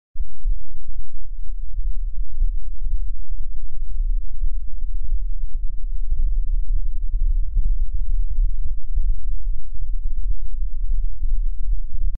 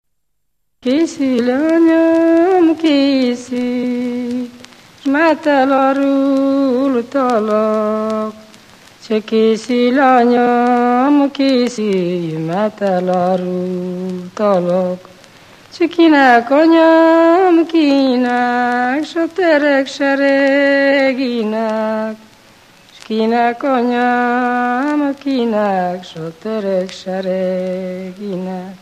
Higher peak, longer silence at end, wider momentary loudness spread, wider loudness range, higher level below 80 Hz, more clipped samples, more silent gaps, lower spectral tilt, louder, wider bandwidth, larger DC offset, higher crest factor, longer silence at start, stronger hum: second, -8 dBFS vs 0 dBFS; about the same, 0 s vs 0.05 s; second, 8 LU vs 11 LU; about the same, 5 LU vs 6 LU; first, -20 dBFS vs -64 dBFS; neither; neither; first, -14 dB/octave vs -6 dB/octave; second, -30 LUFS vs -14 LUFS; second, 0.3 kHz vs 10 kHz; neither; second, 6 dB vs 14 dB; second, 0.15 s vs 0.85 s; neither